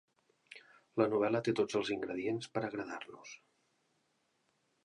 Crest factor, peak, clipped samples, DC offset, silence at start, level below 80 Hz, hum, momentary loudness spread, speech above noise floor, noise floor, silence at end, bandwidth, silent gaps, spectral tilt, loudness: 22 dB; -16 dBFS; under 0.1%; under 0.1%; 0.5 s; -78 dBFS; none; 23 LU; 43 dB; -78 dBFS; 1.5 s; 11 kHz; none; -5.5 dB/octave; -36 LUFS